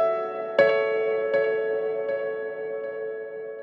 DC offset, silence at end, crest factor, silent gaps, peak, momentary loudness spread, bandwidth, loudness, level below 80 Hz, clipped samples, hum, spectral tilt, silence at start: under 0.1%; 0 s; 18 dB; none; -6 dBFS; 12 LU; 5.6 kHz; -26 LUFS; -80 dBFS; under 0.1%; none; -6 dB/octave; 0 s